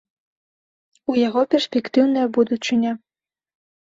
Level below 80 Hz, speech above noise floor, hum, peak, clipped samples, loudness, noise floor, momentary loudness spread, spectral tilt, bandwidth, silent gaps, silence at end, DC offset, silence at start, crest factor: -68 dBFS; over 71 dB; none; -4 dBFS; under 0.1%; -20 LUFS; under -90 dBFS; 7 LU; -5 dB/octave; 7.8 kHz; none; 1 s; under 0.1%; 1.1 s; 16 dB